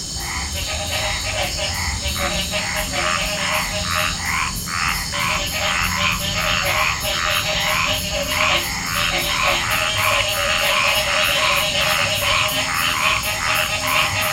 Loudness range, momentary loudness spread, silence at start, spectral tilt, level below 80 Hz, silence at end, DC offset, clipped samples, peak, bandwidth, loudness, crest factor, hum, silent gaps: 4 LU; 5 LU; 0 s; -1.5 dB/octave; -34 dBFS; 0 s; under 0.1%; under 0.1%; -2 dBFS; 17 kHz; -18 LUFS; 18 dB; none; none